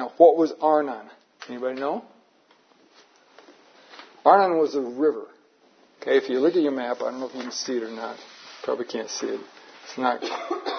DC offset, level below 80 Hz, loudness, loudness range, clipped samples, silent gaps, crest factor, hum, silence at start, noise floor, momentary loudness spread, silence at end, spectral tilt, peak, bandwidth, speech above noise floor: under 0.1%; -88 dBFS; -24 LUFS; 8 LU; under 0.1%; none; 24 dB; none; 0 s; -60 dBFS; 19 LU; 0 s; -4 dB/octave; -2 dBFS; 6.6 kHz; 37 dB